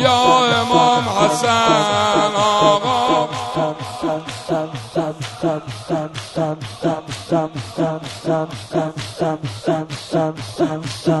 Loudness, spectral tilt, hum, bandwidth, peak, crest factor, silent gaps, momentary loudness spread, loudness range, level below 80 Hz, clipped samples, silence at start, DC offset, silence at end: -18 LUFS; -4.5 dB/octave; none; 11.5 kHz; 0 dBFS; 18 dB; none; 10 LU; 8 LU; -52 dBFS; under 0.1%; 0 s; under 0.1%; 0 s